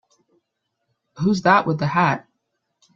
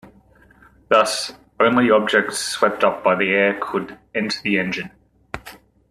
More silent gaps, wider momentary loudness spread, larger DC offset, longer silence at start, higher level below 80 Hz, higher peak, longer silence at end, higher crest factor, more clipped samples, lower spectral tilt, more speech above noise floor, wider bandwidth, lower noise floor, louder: neither; second, 8 LU vs 16 LU; neither; first, 1.15 s vs 0.05 s; about the same, -60 dBFS vs -56 dBFS; about the same, 0 dBFS vs -2 dBFS; first, 0.75 s vs 0.35 s; about the same, 22 dB vs 20 dB; neither; first, -6.5 dB/octave vs -3.5 dB/octave; first, 58 dB vs 33 dB; second, 7.6 kHz vs 13.5 kHz; first, -77 dBFS vs -52 dBFS; about the same, -19 LUFS vs -19 LUFS